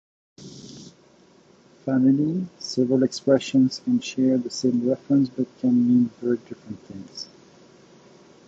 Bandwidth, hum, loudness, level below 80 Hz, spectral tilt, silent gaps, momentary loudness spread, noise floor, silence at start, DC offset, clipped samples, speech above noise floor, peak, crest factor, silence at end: 7.8 kHz; none; -22 LUFS; -66 dBFS; -6.5 dB/octave; none; 20 LU; -55 dBFS; 0.4 s; under 0.1%; under 0.1%; 33 dB; -6 dBFS; 18 dB; 1.2 s